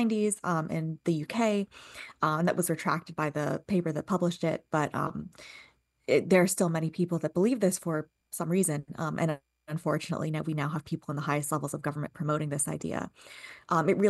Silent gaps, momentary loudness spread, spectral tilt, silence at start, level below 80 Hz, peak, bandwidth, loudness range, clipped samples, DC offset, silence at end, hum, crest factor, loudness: none; 13 LU; -5.5 dB/octave; 0 s; -66 dBFS; -12 dBFS; 12.5 kHz; 4 LU; under 0.1%; under 0.1%; 0 s; none; 18 dB; -30 LUFS